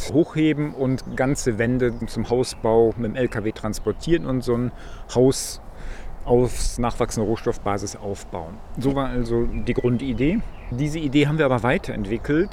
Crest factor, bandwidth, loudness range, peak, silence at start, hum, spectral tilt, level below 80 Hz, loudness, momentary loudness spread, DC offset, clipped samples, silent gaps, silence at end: 18 dB; 16 kHz; 3 LU; -4 dBFS; 0 s; none; -6 dB/octave; -34 dBFS; -23 LUFS; 12 LU; under 0.1%; under 0.1%; none; 0 s